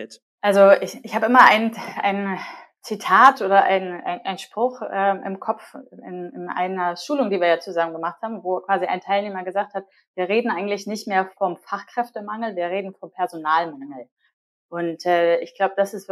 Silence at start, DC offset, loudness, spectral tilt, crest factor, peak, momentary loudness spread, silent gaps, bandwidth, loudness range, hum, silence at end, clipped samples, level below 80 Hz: 0 s; under 0.1%; -21 LUFS; -5 dB/octave; 22 dB; 0 dBFS; 19 LU; 0.22-0.38 s, 10.07-10.14 s, 14.12-14.16 s, 14.33-14.69 s; 14 kHz; 9 LU; none; 0 s; under 0.1%; -74 dBFS